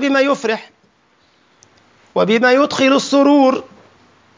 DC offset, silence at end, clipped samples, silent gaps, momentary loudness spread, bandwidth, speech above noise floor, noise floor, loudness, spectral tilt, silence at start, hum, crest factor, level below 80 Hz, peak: under 0.1%; 0.75 s; under 0.1%; none; 12 LU; 7.6 kHz; 43 dB; -56 dBFS; -14 LUFS; -4.5 dB/octave; 0 s; none; 14 dB; -66 dBFS; -2 dBFS